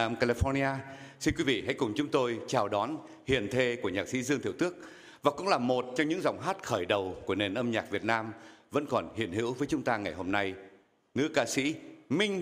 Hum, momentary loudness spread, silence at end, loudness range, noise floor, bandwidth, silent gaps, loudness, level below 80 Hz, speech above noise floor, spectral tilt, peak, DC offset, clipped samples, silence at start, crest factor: none; 7 LU; 0 s; 2 LU; -58 dBFS; 15.5 kHz; none; -31 LUFS; -52 dBFS; 27 dB; -5 dB/octave; -8 dBFS; under 0.1%; under 0.1%; 0 s; 22 dB